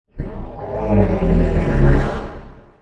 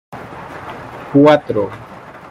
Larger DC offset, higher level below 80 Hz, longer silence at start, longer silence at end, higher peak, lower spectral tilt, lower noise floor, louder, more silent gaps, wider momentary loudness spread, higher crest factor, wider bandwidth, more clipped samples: neither; first, -22 dBFS vs -52 dBFS; about the same, 0.15 s vs 0.1 s; about the same, 0.2 s vs 0.15 s; about the same, 0 dBFS vs -2 dBFS; first, -9.5 dB/octave vs -7.5 dB/octave; first, -38 dBFS vs -31 dBFS; second, -18 LUFS vs -13 LUFS; neither; second, 15 LU vs 23 LU; about the same, 16 dB vs 16 dB; second, 7.8 kHz vs 9.4 kHz; neither